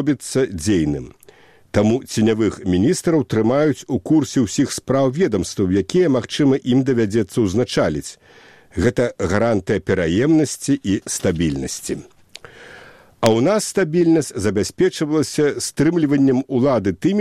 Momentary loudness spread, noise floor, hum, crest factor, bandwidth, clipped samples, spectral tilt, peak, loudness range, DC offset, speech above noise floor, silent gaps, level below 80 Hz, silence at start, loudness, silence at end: 5 LU; -48 dBFS; none; 18 dB; 15 kHz; under 0.1%; -5.5 dB/octave; 0 dBFS; 3 LU; 0.2%; 30 dB; none; -44 dBFS; 0 s; -18 LUFS; 0 s